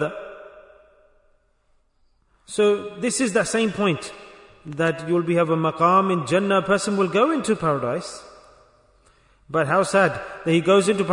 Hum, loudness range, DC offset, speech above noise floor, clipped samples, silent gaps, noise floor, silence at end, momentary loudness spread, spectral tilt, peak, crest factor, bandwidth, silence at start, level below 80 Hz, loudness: none; 5 LU; under 0.1%; 43 dB; under 0.1%; none; -63 dBFS; 0 s; 15 LU; -5 dB/octave; -6 dBFS; 18 dB; 11 kHz; 0 s; -60 dBFS; -21 LUFS